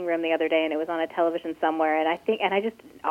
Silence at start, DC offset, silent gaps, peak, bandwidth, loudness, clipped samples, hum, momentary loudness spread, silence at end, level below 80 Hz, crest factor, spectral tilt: 0 s; under 0.1%; none; -8 dBFS; 14 kHz; -25 LUFS; under 0.1%; none; 4 LU; 0 s; -72 dBFS; 16 dB; -6 dB/octave